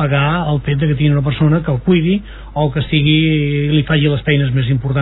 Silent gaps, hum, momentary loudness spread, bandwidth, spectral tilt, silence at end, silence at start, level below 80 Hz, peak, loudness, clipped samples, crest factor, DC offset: none; none; 5 LU; 4.1 kHz; -10.5 dB/octave; 0 s; 0 s; -32 dBFS; 0 dBFS; -15 LUFS; under 0.1%; 14 dB; under 0.1%